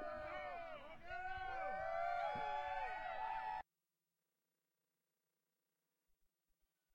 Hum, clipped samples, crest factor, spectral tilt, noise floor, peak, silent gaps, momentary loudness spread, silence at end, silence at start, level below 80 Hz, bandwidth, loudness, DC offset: none; under 0.1%; 18 dB; -4.5 dB/octave; under -90 dBFS; -30 dBFS; none; 9 LU; 0.7 s; 0 s; -66 dBFS; 16 kHz; -46 LUFS; under 0.1%